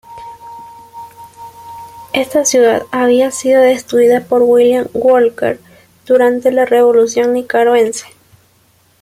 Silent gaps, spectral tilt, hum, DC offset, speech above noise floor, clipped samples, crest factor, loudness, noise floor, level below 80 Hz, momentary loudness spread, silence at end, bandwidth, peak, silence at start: none; -3 dB/octave; none; under 0.1%; 41 dB; under 0.1%; 12 dB; -11 LUFS; -52 dBFS; -56 dBFS; 22 LU; 1 s; 15 kHz; -2 dBFS; 0.1 s